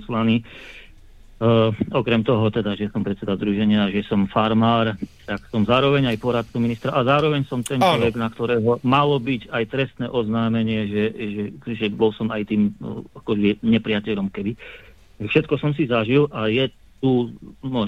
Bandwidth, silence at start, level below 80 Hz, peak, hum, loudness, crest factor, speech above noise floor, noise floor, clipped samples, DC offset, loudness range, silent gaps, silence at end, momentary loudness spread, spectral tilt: 13.5 kHz; 0 s; -48 dBFS; -4 dBFS; none; -21 LUFS; 16 dB; 25 dB; -45 dBFS; under 0.1%; 0.2%; 3 LU; none; 0 s; 11 LU; -7 dB/octave